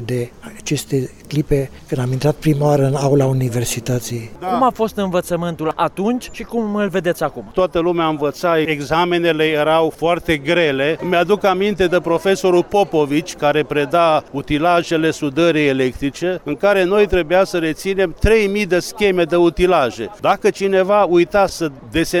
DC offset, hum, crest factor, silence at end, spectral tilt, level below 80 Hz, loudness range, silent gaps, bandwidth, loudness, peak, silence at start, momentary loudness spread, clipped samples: under 0.1%; none; 12 dB; 0 s; -5.5 dB/octave; -36 dBFS; 4 LU; none; 17 kHz; -17 LUFS; -4 dBFS; 0 s; 8 LU; under 0.1%